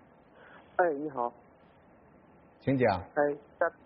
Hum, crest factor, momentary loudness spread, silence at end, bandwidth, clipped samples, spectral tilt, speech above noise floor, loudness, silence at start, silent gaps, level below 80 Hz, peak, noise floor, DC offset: none; 20 dB; 9 LU; 0.15 s; 5 kHz; under 0.1%; -6 dB/octave; 29 dB; -31 LUFS; 0.55 s; none; -66 dBFS; -14 dBFS; -59 dBFS; under 0.1%